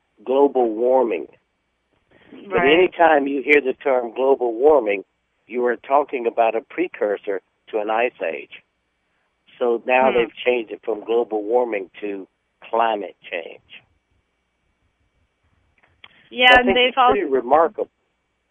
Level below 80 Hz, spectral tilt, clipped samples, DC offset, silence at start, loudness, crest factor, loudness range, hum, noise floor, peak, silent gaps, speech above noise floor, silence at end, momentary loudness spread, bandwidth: -54 dBFS; -5.5 dB/octave; under 0.1%; under 0.1%; 0.25 s; -19 LUFS; 20 dB; 10 LU; none; -70 dBFS; 0 dBFS; none; 52 dB; 0.65 s; 15 LU; 8 kHz